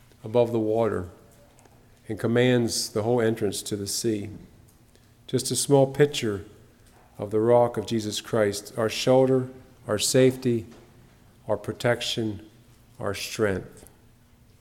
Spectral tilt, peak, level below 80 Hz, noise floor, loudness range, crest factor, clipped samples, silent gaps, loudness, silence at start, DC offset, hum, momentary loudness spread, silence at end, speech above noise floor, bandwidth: -4.5 dB/octave; -6 dBFS; -58 dBFS; -56 dBFS; 6 LU; 20 dB; under 0.1%; none; -25 LUFS; 0.25 s; under 0.1%; none; 14 LU; 0.75 s; 32 dB; 17 kHz